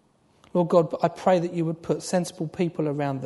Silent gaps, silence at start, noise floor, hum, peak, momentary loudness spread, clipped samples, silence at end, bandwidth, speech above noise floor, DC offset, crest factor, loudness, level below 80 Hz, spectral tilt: none; 0.55 s; -59 dBFS; none; -6 dBFS; 7 LU; under 0.1%; 0 s; 11.5 kHz; 35 dB; under 0.1%; 18 dB; -25 LUFS; -66 dBFS; -6.5 dB/octave